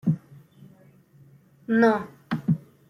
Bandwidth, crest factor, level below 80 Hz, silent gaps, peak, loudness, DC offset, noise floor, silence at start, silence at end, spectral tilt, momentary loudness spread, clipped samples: 9.8 kHz; 20 dB; -66 dBFS; none; -8 dBFS; -25 LUFS; under 0.1%; -55 dBFS; 0.05 s; 0.35 s; -8.5 dB/octave; 12 LU; under 0.1%